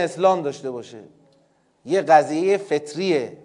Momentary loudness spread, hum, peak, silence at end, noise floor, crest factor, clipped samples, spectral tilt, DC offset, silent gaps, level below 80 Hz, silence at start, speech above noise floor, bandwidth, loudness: 16 LU; none; -2 dBFS; 0.1 s; -61 dBFS; 20 dB; under 0.1%; -5 dB/octave; under 0.1%; none; -78 dBFS; 0 s; 41 dB; 11 kHz; -20 LUFS